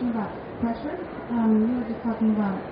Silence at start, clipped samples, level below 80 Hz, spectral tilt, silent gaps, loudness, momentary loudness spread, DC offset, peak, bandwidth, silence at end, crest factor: 0 s; under 0.1%; -52 dBFS; -7.5 dB/octave; none; -26 LUFS; 11 LU; under 0.1%; -12 dBFS; 5 kHz; 0 s; 14 dB